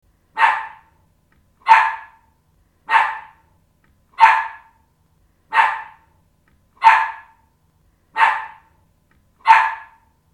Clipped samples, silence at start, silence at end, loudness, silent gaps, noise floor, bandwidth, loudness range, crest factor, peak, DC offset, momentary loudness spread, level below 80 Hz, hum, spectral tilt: under 0.1%; 0.35 s; 0.5 s; -16 LUFS; none; -60 dBFS; 11.5 kHz; 2 LU; 20 dB; 0 dBFS; under 0.1%; 20 LU; -62 dBFS; none; 0 dB/octave